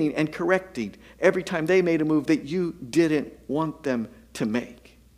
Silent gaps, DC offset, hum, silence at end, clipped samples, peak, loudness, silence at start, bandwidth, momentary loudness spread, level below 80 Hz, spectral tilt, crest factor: none; under 0.1%; none; 0.45 s; under 0.1%; -4 dBFS; -25 LUFS; 0 s; 14.5 kHz; 10 LU; -58 dBFS; -6.5 dB/octave; 20 dB